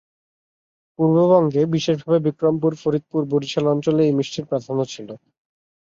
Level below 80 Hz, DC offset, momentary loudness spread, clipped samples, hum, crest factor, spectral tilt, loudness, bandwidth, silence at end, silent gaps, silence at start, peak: -62 dBFS; under 0.1%; 9 LU; under 0.1%; none; 18 dB; -7 dB/octave; -20 LUFS; 7.6 kHz; 0.8 s; none; 1 s; -4 dBFS